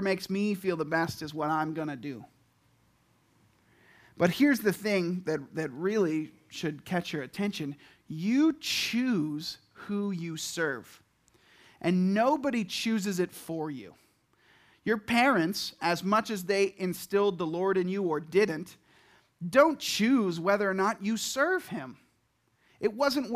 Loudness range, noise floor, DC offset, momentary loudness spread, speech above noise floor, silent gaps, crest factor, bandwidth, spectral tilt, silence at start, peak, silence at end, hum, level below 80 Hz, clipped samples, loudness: 5 LU; -72 dBFS; under 0.1%; 13 LU; 43 dB; none; 22 dB; 15.5 kHz; -5 dB/octave; 0 s; -8 dBFS; 0 s; none; -70 dBFS; under 0.1%; -29 LUFS